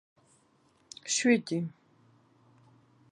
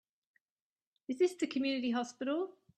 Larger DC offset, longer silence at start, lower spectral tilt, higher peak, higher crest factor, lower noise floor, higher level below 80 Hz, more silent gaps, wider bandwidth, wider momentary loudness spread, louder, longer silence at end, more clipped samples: neither; about the same, 1.05 s vs 1.1 s; about the same, -3.5 dB/octave vs -3.5 dB/octave; first, -12 dBFS vs -20 dBFS; first, 22 dB vs 16 dB; second, -67 dBFS vs under -90 dBFS; about the same, -82 dBFS vs -84 dBFS; neither; about the same, 11 kHz vs 11 kHz; first, 19 LU vs 8 LU; first, -29 LUFS vs -35 LUFS; first, 1.45 s vs 0.25 s; neither